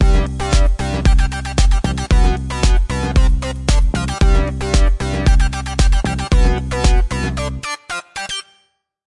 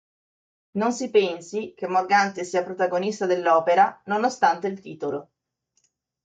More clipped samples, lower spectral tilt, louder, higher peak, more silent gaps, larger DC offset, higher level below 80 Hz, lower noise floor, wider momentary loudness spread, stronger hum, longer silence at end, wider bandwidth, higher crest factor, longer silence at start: neither; about the same, -5 dB/octave vs -4.5 dB/octave; first, -18 LUFS vs -23 LUFS; first, -2 dBFS vs -6 dBFS; neither; neither; first, -16 dBFS vs -74 dBFS; second, -61 dBFS vs -73 dBFS; second, 8 LU vs 11 LU; neither; second, 0.65 s vs 1 s; first, 11 kHz vs 9.2 kHz; second, 12 dB vs 18 dB; second, 0 s vs 0.75 s